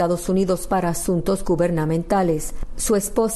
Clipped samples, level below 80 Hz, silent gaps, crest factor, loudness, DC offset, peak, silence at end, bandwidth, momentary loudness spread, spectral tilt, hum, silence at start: under 0.1%; -34 dBFS; none; 12 dB; -21 LUFS; under 0.1%; -8 dBFS; 0 s; 12.5 kHz; 3 LU; -5.5 dB/octave; none; 0 s